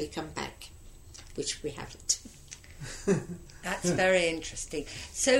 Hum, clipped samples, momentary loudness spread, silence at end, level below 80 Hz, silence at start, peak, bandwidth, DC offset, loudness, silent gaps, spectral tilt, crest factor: none; under 0.1%; 22 LU; 0 s; -50 dBFS; 0 s; -12 dBFS; 16 kHz; under 0.1%; -31 LUFS; none; -3 dB/octave; 20 dB